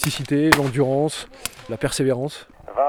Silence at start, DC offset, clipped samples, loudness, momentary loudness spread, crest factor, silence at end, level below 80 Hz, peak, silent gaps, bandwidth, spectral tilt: 0 s; under 0.1%; under 0.1%; -21 LUFS; 14 LU; 22 dB; 0 s; -46 dBFS; 0 dBFS; none; over 20 kHz; -4.5 dB/octave